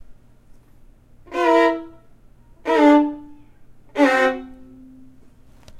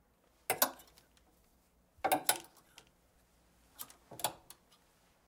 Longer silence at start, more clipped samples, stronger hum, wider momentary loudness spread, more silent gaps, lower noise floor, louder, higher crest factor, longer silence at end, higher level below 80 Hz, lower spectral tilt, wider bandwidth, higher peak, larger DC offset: second, 0.1 s vs 0.5 s; neither; neither; second, 18 LU vs 24 LU; neither; second, -48 dBFS vs -71 dBFS; first, -18 LUFS vs -35 LUFS; second, 16 dB vs 30 dB; second, 0 s vs 0.9 s; first, -52 dBFS vs -74 dBFS; first, -4.5 dB/octave vs -1 dB/octave; second, 11 kHz vs 17.5 kHz; first, -4 dBFS vs -10 dBFS; neither